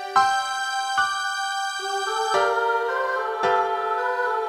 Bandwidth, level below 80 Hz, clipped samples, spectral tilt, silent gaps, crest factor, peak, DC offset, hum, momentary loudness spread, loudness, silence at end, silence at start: 16 kHz; -66 dBFS; under 0.1%; -0.5 dB/octave; none; 16 dB; -6 dBFS; under 0.1%; none; 5 LU; -23 LUFS; 0 s; 0 s